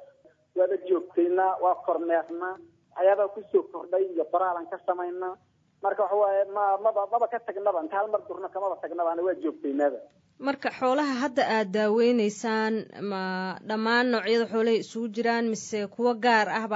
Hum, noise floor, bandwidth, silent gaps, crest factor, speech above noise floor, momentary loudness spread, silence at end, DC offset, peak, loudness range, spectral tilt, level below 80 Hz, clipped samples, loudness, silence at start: none; -58 dBFS; 8 kHz; none; 18 dB; 32 dB; 9 LU; 0 s; under 0.1%; -10 dBFS; 3 LU; -5 dB/octave; -84 dBFS; under 0.1%; -27 LUFS; 0 s